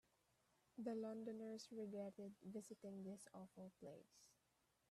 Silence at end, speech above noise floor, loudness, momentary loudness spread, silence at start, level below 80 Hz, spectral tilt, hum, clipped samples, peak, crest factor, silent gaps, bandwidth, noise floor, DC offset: 0.6 s; 31 dB; -55 LUFS; 11 LU; 0.75 s; under -90 dBFS; -6 dB/octave; none; under 0.1%; -36 dBFS; 18 dB; none; 13.5 kHz; -85 dBFS; under 0.1%